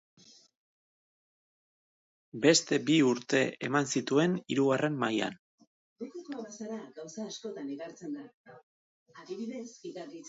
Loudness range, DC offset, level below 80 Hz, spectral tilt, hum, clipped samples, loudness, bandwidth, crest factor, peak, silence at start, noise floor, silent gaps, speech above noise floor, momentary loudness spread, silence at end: 14 LU; under 0.1%; -78 dBFS; -4 dB/octave; none; under 0.1%; -30 LUFS; 8 kHz; 22 dB; -10 dBFS; 2.35 s; under -90 dBFS; 5.39-5.58 s, 5.67-5.96 s, 8.34-8.44 s, 8.63-9.06 s; over 59 dB; 18 LU; 0 s